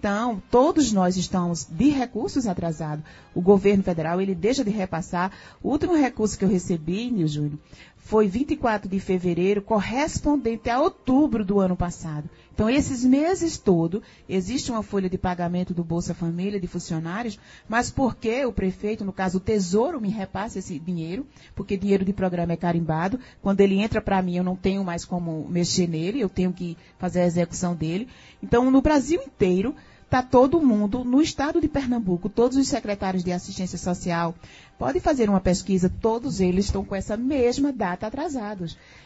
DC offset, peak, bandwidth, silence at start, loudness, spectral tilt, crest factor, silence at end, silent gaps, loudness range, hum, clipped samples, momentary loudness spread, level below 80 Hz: under 0.1%; -4 dBFS; 8 kHz; 0 s; -24 LUFS; -6 dB/octave; 20 dB; 0.3 s; none; 5 LU; none; under 0.1%; 10 LU; -44 dBFS